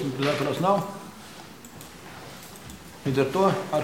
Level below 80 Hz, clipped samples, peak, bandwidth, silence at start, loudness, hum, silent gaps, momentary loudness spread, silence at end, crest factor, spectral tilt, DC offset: -58 dBFS; under 0.1%; -6 dBFS; 17 kHz; 0 s; -25 LUFS; none; none; 20 LU; 0 s; 20 dB; -6 dB/octave; 0.2%